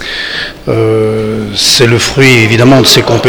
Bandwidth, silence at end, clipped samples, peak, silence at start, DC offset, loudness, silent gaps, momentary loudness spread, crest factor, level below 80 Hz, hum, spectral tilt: over 20 kHz; 0 s; 3%; 0 dBFS; 0 s; under 0.1%; -7 LUFS; none; 10 LU; 8 dB; -34 dBFS; none; -4 dB/octave